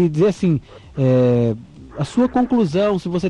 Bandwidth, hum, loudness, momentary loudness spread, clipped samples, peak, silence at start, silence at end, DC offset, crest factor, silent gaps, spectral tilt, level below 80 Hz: 10 kHz; none; -18 LUFS; 13 LU; under 0.1%; -6 dBFS; 0 s; 0 s; under 0.1%; 10 dB; none; -8 dB/octave; -46 dBFS